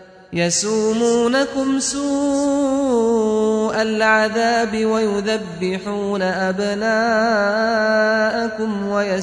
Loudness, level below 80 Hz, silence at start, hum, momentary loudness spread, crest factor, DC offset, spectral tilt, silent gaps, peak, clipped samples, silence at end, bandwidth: -18 LUFS; -52 dBFS; 0 s; none; 6 LU; 16 dB; under 0.1%; -4 dB/octave; none; -2 dBFS; under 0.1%; 0 s; 10.5 kHz